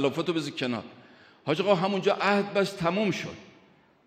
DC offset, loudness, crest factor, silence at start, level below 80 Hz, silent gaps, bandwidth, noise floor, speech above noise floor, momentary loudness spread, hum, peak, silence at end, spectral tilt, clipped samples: under 0.1%; -27 LUFS; 20 dB; 0 s; -68 dBFS; none; 15 kHz; -59 dBFS; 33 dB; 14 LU; none; -8 dBFS; 0.6 s; -5.5 dB/octave; under 0.1%